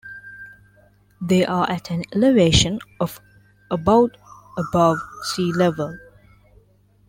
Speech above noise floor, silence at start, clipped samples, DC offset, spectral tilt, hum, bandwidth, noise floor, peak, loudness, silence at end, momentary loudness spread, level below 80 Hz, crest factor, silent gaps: 37 dB; 0.05 s; under 0.1%; under 0.1%; -5 dB/octave; 50 Hz at -45 dBFS; 16.5 kHz; -56 dBFS; -2 dBFS; -20 LUFS; 1.1 s; 18 LU; -42 dBFS; 18 dB; none